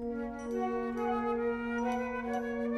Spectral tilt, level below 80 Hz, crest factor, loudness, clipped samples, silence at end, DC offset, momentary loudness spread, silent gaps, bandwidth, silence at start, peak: -6 dB/octave; -56 dBFS; 12 dB; -34 LUFS; under 0.1%; 0 s; under 0.1%; 4 LU; none; 12 kHz; 0 s; -22 dBFS